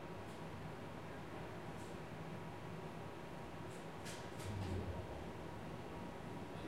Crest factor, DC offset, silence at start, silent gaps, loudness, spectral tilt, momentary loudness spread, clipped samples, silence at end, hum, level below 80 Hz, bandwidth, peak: 16 dB; 0.1%; 0 s; none; -49 LUFS; -6 dB/octave; 5 LU; under 0.1%; 0 s; none; -64 dBFS; 16 kHz; -32 dBFS